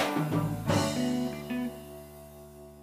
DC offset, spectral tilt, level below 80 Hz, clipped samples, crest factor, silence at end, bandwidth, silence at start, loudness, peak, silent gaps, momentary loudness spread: under 0.1%; -5.5 dB/octave; -54 dBFS; under 0.1%; 16 dB; 0 s; 15.5 kHz; 0 s; -31 LUFS; -14 dBFS; none; 20 LU